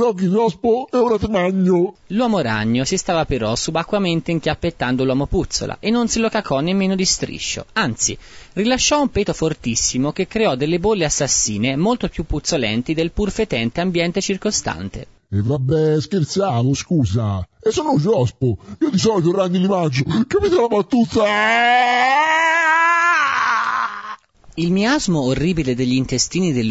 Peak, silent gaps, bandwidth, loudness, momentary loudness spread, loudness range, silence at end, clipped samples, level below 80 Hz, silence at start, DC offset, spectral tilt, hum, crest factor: -4 dBFS; none; 8 kHz; -18 LUFS; 8 LU; 5 LU; 0 s; under 0.1%; -38 dBFS; 0 s; under 0.1%; -4.5 dB/octave; none; 14 dB